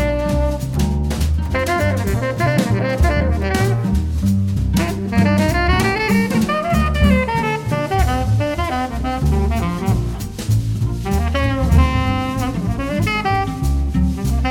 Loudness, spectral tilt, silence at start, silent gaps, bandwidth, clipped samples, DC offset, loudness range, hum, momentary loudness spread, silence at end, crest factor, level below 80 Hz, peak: -18 LUFS; -6.5 dB/octave; 0 s; none; 17.5 kHz; under 0.1%; under 0.1%; 3 LU; none; 5 LU; 0 s; 16 dB; -22 dBFS; -2 dBFS